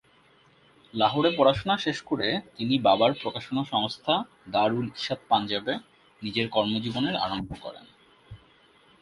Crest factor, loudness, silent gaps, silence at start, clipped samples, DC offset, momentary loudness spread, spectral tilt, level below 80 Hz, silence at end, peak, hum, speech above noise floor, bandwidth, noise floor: 22 dB; -26 LUFS; none; 0.95 s; under 0.1%; under 0.1%; 11 LU; -6 dB/octave; -58 dBFS; 0.65 s; -6 dBFS; none; 34 dB; 11.5 kHz; -60 dBFS